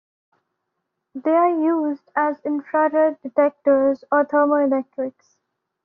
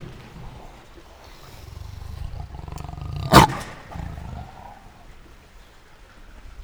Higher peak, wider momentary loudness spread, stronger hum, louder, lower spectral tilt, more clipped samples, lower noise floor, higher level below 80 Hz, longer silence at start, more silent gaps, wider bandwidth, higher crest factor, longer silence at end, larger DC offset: second, -6 dBFS vs 0 dBFS; second, 9 LU vs 30 LU; neither; about the same, -20 LUFS vs -19 LUFS; about the same, -5 dB/octave vs -5 dB/octave; neither; first, -78 dBFS vs -48 dBFS; second, -70 dBFS vs -38 dBFS; first, 1.15 s vs 0 s; neither; second, 3.3 kHz vs over 20 kHz; second, 16 dB vs 26 dB; first, 0.75 s vs 0 s; neither